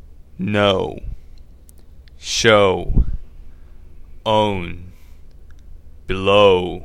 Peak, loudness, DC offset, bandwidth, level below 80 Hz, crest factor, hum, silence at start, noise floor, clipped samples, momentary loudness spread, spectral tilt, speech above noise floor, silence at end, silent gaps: 0 dBFS; -17 LUFS; 0.4%; 14 kHz; -30 dBFS; 20 dB; none; 0.05 s; -42 dBFS; under 0.1%; 21 LU; -4.5 dB/octave; 26 dB; 0 s; none